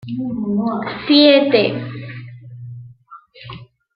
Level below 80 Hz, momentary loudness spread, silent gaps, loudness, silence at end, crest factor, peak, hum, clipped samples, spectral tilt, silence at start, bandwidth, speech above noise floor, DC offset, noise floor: -58 dBFS; 25 LU; none; -15 LUFS; 0.3 s; 16 dB; -2 dBFS; none; under 0.1%; -9.5 dB/octave; 0.05 s; 5.4 kHz; 28 dB; under 0.1%; -44 dBFS